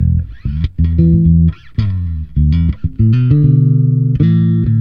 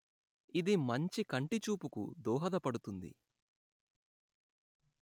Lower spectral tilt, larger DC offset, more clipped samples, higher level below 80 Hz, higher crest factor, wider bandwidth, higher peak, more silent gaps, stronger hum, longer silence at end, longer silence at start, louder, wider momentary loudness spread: first, -11.5 dB/octave vs -6 dB/octave; neither; neither; first, -22 dBFS vs -82 dBFS; second, 12 dB vs 18 dB; second, 5.2 kHz vs 18.5 kHz; first, 0 dBFS vs -20 dBFS; neither; neither; second, 0 s vs 1.9 s; second, 0 s vs 0.55 s; first, -13 LUFS vs -38 LUFS; about the same, 9 LU vs 11 LU